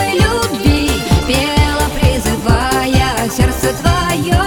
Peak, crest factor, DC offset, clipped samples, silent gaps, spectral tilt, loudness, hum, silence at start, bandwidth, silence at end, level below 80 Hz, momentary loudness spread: 0 dBFS; 12 dB; under 0.1%; under 0.1%; none; -5 dB/octave; -14 LUFS; none; 0 s; 19.5 kHz; 0 s; -20 dBFS; 2 LU